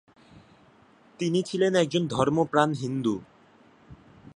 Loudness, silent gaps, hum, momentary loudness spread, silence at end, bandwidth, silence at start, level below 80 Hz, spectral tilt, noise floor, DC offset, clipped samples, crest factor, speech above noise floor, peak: -26 LUFS; none; none; 7 LU; 0.05 s; 11 kHz; 0.35 s; -62 dBFS; -6 dB/octave; -57 dBFS; under 0.1%; under 0.1%; 22 dB; 33 dB; -6 dBFS